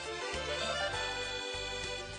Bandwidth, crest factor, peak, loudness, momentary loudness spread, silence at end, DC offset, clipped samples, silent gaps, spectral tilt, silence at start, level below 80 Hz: 10 kHz; 16 dB; -22 dBFS; -36 LUFS; 4 LU; 0 s; under 0.1%; under 0.1%; none; -2 dB/octave; 0 s; -54 dBFS